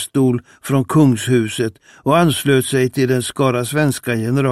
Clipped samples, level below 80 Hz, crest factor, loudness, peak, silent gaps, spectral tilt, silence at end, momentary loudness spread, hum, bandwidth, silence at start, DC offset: under 0.1%; -54 dBFS; 14 dB; -17 LUFS; -2 dBFS; none; -5.5 dB/octave; 0 s; 7 LU; none; 15.5 kHz; 0 s; 0.2%